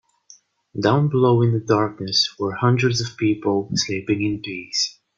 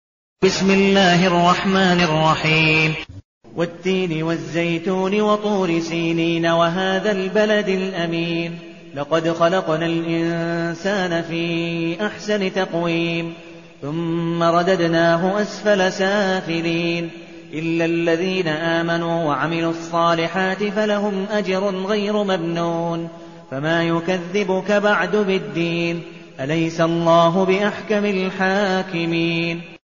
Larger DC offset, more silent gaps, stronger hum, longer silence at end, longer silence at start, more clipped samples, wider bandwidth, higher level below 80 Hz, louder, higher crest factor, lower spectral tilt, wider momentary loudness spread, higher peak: second, under 0.1% vs 0.3%; second, none vs 3.25-3.41 s; neither; about the same, 0.25 s vs 0.15 s; first, 0.75 s vs 0.4 s; neither; about the same, 7.6 kHz vs 7.4 kHz; about the same, -56 dBFS vs -54 dBFS; about the same, -20 LUFS vs -19 LUFS; about the same, 18 dB vs 16 dB; about the same, -5 dB/octave vs -4 dB/octave; second, 6 LU vs 10 LU; about the same, -4 dBFS vs -4 dBFS